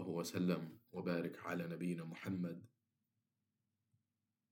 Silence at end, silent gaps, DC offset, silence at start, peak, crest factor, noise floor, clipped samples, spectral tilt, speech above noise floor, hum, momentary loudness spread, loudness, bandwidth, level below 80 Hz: 1.85 s; none; under 0.1%; 0 s; -26 dBFS; 20 dB; -90 dBFS; under 0.1%; -6.5 dB/octave; 47 dB; none; 7 LU; -43 LUFS; 17 kHz; -88 dBFS